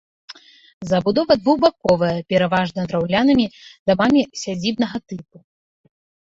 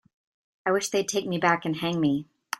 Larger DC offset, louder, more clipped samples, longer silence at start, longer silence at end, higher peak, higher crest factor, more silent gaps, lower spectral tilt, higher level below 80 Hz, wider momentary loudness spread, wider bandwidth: neither; first, -19 LUFS vs -26 LUFS; neither; second, 0.3 s vs 0.65 s; first, 1.1 s vs 0.35 s; first, -2 dBFS vs -6 dBFS; about the same, 18 dB vs 22 dB; first, 0.73-0.81 s, 3.79-3.86 s vs none; first, -6 dB/octave vs -4.5 dB/octave; first, -52 dBFS vs -68 dBFS; first, 10 LU vs 5 LU; second, 7.8 kHz vs 16 kHz